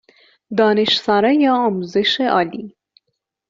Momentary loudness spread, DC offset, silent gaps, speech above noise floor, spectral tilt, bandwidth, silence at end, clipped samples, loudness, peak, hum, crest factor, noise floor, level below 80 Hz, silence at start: 9 LU; under 0.1%; none; 59 dB; -2.5 dB/octave; 7.6 kHz; 0.8 s; under 0.1%; -16 LUFS; -2 dBFS; none; 16 dB; -75 dBFS; -62 dBFS; 0.5 s